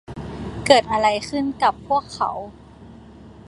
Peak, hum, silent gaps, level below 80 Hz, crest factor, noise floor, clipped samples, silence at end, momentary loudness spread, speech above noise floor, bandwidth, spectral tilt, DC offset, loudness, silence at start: 0 dBFS; none; none; -46 dBFS; 22 dB; -43 dBFS; under 0.1%; 0 s; 17 LU; 23 dB; 11.5 kHz; -4 dB/octave; under 0.1%; -20 LUFS; 0.1 s